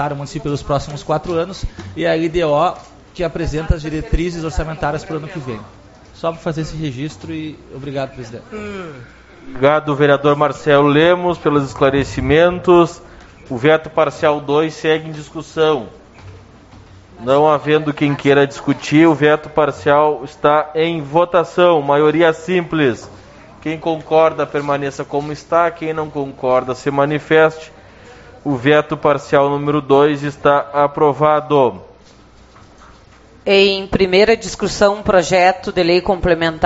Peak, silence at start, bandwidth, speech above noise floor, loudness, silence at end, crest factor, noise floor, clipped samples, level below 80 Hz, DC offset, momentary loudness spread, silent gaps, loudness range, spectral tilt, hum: 0 dBFS; 0 s; 8 kHz; 29 dB; -15 LUFS; 0 s; 16 dB; -44 dBFS; under 0.1%; -36 dBFS; under 0.1%; 15 LU; none; 8 LU; -4.5 dB/octave; none